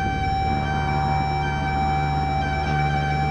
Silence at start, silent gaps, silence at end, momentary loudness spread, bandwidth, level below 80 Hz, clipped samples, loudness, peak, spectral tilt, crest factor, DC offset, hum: 0 s; none; 0 s; 1 LU; 9 kHz; -30 dBFS; under 0.1%; -23 LUFS; -10 dBFS; -6.5 dB/octave; 12 dB; 0.6%; none